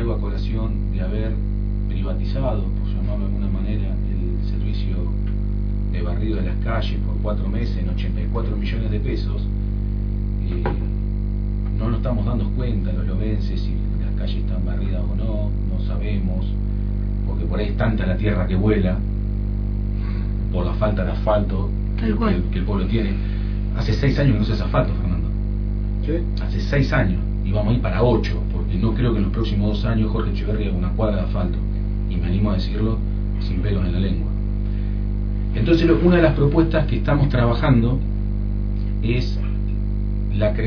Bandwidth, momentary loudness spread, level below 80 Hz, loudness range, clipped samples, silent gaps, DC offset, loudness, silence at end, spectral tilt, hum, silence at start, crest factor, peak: 5.4 kHz; 7 LU; -22 dBFS; 5 LU; under 0.1%; none; under 0.1%; -22 LUFS; 0 s; -9 dB/octave; 50 Hz at -20 dBFS; 0 s; 18 dB; -2 dBFS